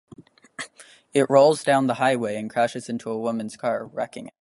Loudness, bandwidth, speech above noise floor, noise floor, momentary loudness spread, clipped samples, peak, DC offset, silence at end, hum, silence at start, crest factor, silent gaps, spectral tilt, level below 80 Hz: -23 LUFS; 11.5 kHz; 29 dB; -51 dBFS; 20 LU; under 0.1%; -4 dBFS; under 0.1%; 0.1 s; none; 0.2 s; 20 dB; none; -5 dB/octave; -70 dBFS